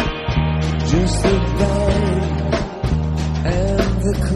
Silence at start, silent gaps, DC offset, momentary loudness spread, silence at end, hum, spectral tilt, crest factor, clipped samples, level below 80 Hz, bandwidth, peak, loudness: 0 s; none; under 0.1%; 4 LU; 0 s; none; -6.5 dB/octave; 14 dB; under 0.1%; -24 dBFS; 12.5 kHz; -2 dBFS; -19 LUFS